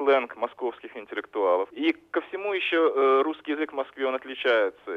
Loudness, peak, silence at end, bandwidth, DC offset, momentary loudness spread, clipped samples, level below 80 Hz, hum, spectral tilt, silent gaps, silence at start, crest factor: -26 LUFS; -12 dBFS; 0 s; 5.6 kHz; under 0.1%; 11 LU; under 0.1%; -76 dBFS; none; -4.5 dB/octave; none; 0 s; 14 dB